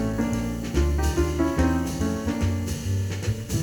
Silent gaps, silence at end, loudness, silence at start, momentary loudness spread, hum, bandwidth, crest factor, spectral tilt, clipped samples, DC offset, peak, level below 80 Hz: none; 0 s; -26 LUFS; 0 s; 5 LU; none; 19.5 kHz; 16 dB; -6 dB/octave; under 0.1%; under 0.1%; -8 dBFS; -30 dBFS